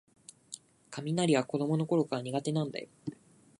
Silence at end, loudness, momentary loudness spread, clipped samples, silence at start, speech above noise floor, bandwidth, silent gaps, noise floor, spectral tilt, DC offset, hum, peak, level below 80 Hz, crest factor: 0.45 s; -32 LUFS; 19 LU; under 0.1%; 0.5 s; 21 dB; 11.5 kHz; none; -52 dBFS; -6 dB/octave; under 0.1%; none; -14 dBFS; -76 dBFS; 20 dB